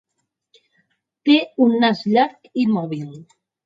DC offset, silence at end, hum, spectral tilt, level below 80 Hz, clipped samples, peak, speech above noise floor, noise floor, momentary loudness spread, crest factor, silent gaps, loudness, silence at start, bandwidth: under 0.1%; 0.4 s; none; -7 dB/octave; -70 dBFS; under 0.1%; -2 dBFS; 58 dB; -76 dBFS; 13 LU; 18 dB; none; -18 LUFS; 1.25 s; 7.6 kHz